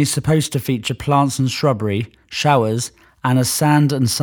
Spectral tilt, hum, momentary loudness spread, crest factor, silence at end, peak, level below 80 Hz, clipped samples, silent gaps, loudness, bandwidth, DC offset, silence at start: -5 dB/octave; none; 9 LU; 16 dB; 0 s; -2 dBFS; -48 dBFS; under 0.1%; none; -18 LUFS; over 20 kHz; under 0.1%; 0 s